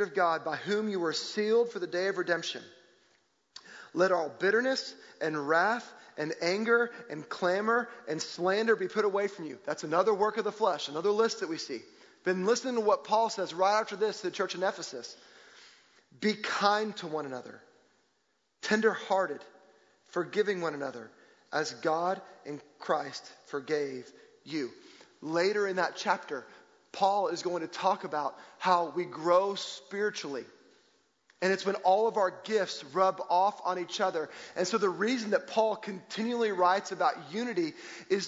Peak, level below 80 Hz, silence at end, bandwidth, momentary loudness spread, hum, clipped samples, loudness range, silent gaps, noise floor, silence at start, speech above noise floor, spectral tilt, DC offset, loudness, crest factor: -10 dBFS; -84 dBFS; 0 s; 7.8 kHz; 13 LU; none; under 0.1%; 4 LU; none; -76 dBFS; 0 s; 45 dB; -4 dB/octave; under 0.1%; -31 LUFS; 20 dB